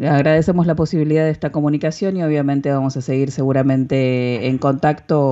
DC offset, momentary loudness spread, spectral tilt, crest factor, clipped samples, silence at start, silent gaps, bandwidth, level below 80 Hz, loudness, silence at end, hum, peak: under 0.1%; 5 LU; -8 dB/octave; 14 dB; under 0.1%; 0 s; none; 8 kHz; -46 dBFS; -17 LUFS; 0 s; none; -2 dBFS